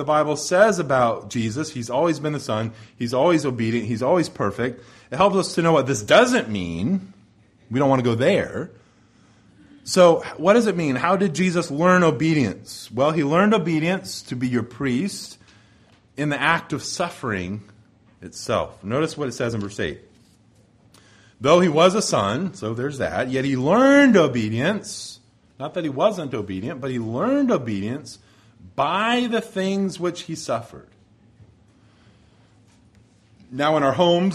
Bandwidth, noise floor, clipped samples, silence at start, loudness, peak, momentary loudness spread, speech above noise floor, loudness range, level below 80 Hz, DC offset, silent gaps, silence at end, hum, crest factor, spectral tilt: 13.5 kHz; -56 dBFS; under 0.1%; 0 s; -21 LUFS; -2 dBFS; 14 LU; 35 dB; 8 LU; -56 dBFS; under 0.1%; none; 0 s; none; 20 dB; -5.5 dB/octave